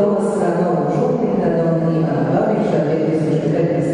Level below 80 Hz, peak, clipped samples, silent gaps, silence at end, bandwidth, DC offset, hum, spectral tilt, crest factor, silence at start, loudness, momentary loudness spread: -50 dBFS; -6 dBFS; under 0.1%; none; 0 s; 10.5 kHz; under 0.1%; none; -8.5 dB/octave; 10 dB; 0 s; -17 LUFS; 1 LU